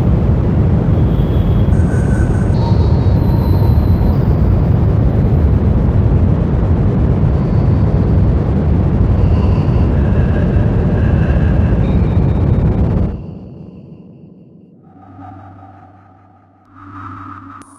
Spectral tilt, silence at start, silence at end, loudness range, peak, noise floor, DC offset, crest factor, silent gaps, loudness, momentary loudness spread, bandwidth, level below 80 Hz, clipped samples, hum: -10 dB/octave; 0 s; 0.2 s; 5 LU; 0 dBFS; -46 dBFS; under 0.1%; 12 dB; none; -13 LUFS; 16 LU; 8.8 kHz; -18 dBFS; under 0.1%; none